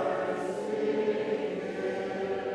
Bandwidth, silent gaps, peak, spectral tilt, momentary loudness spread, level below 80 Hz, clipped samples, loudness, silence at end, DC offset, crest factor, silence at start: 11 kHz; none; -18 dBFS; -6 dB/octave; 4 LU; -70 dBFS; under 0.1%; -31 LUFS; 0 s; under 0.1%; 14 dB; 0 s